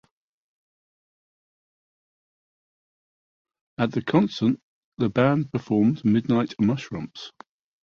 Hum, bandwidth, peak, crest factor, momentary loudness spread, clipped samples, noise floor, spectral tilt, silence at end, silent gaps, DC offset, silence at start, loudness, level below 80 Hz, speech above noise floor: none; 7 kHz; -6 dBFS; 20 dB; 14 LU; under 0.1%; under -90 dBFS; -8 dB/octave; 0.55 s; 4.62-4.92 s; under 0.1%; 3.8 s; -24 LUFS; -60 dBFS; over 67 dB